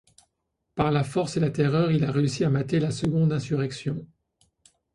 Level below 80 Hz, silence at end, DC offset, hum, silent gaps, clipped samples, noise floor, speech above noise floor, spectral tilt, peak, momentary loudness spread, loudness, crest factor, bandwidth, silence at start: -56 dBFS; 0.9 s; under 0.1%; none; none; under 0.1%; -78 dBFS; 54 dB; -7 dB/octave; -8 dBFS; 8 LU; -25 LUFS; 18 dB; 11.5 kHz; 0.75 s